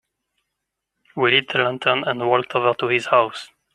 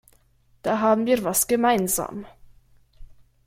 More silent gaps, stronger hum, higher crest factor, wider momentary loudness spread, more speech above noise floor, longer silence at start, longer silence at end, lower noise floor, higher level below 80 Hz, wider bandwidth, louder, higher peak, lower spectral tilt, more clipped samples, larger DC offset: neither; neither; about the same, 20 dB vs 18 dB; second, 7 LU vs 12 LU; first, 61 dB vs 38 dB; first, 1.15 s vs 0.65 s; about the same, 0.3 s vs 0.4 s; first, -80 dBFS vs -60 dBFS; second, -68 dBFS vs -52 dBFS; second, 11 kHz vs 16.5 kHz; first, -19 LUFS vs -22 LUFS; first, -2 dBFS vs -8 dBFS; first, -5 dB/octave vs -3.5 dB/octave; neither; neither